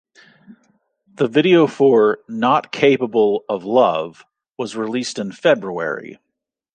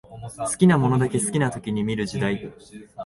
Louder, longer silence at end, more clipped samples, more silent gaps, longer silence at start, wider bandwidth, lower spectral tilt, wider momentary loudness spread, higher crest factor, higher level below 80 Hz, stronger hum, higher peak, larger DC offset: first, -17 LUFS vs -22 LUFS; first, 0.6 s vs 0 s; neither; neither; first, 0.5 s vs 0.1 s; second, 9.4 kHz vs 11.5 kHz; about the same, -5.5 dB/octave vs -6 dB/octave; second, 12 LU vs 17 LU; about the same, 16 dB vs 18 dB; second, -68 dBFS vs -52 dBFS; neither; about the same, -2 dBFS vs -4 dBFS; neither